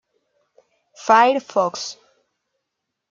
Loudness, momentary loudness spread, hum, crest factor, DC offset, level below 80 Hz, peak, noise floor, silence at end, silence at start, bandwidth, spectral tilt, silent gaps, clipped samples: -18 LUFS; 17 LU; none; 20 dB; under 0.1%; -74 dBFS; -2 dBFS; -79 dBFS; 1.2 s; 1 s; 7.6 kHz; -3 dB/octave; none; under 0.1%